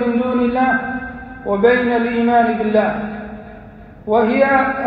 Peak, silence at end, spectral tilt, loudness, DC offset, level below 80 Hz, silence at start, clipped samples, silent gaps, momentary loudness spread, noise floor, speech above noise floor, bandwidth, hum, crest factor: -2 dBFS; 0 s; -9 dB/octave; -16 LUFS; under 0.1%; -44 dBFS; 0 s; under 0.1%; none; 17 LU; -38 dBFS; 23 dB; 5 kHz; none; 16 dB